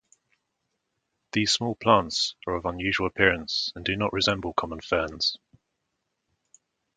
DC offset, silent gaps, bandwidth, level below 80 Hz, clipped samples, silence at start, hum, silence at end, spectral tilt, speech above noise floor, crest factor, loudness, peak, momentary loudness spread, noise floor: under 0.1%; none; 9.6 kHz; -50 dBFS; under 0.1%; 1.35 s; none; 1.6 s; -3.5 dB/octave; 54 dB; 24 dB; -25 LUFS; -4 dBFS; 8 LU; -80 dBFS